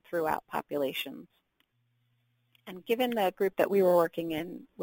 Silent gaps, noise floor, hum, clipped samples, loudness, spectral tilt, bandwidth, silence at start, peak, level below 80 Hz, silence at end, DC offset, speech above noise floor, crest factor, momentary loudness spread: none; -75 dBFS; none; under 0.1%; -29 LUFS; -5.5 dB/octave; 17 kHz; 0.1 s; -12 dBFS; -70 dBFS; 0 s; under 0.1%; 45 dB; 20 dB; 17 LU